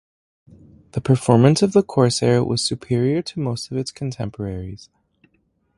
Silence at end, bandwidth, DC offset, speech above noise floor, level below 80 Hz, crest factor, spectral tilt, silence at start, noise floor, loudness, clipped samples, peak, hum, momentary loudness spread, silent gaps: 1 s; 11.5 kHz; under 0.1%; 46 dB; -48 dBFS; 20 dB; -6 dB/octave; 0.95 s; -65 dBFS; -20 LUFS; under 0.1%; 0 dBFS; none; 15 LU; none